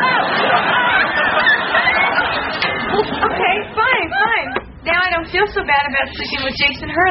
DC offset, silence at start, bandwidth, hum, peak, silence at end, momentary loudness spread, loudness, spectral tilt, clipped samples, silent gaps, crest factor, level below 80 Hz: under 0.1%; 0 s; 6 kHz; none; -2 dBFS; 0 s; 5 LU; -15 LUFS; -0.5 dB/octave; under 0.1%; none; 14 dB; -42 dBFS